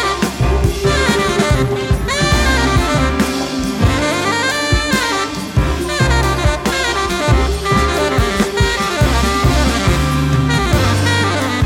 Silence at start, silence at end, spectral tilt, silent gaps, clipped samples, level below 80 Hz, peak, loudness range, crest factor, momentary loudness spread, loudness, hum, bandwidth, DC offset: 0 s; 0 s; -4.5 dB/octave; none; under 0.1%; -22 dBFS; 0 dBFS; 1 LU; 14 dB; 3 LU; -15 LUFS; none; 16.5 kHz; under 0.1%